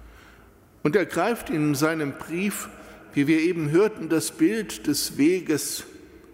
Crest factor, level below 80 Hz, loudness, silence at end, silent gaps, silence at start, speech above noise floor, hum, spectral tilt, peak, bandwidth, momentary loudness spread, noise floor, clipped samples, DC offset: 16 dB; -56 dBFS; -24 LUFS; 0.15 s; none; 0 s; 29 dB; none; -4.5 dB/octave; -8 dBFS; 16 kHz; 9 LU; -53 dBFS; under 0.1%; under 0.1%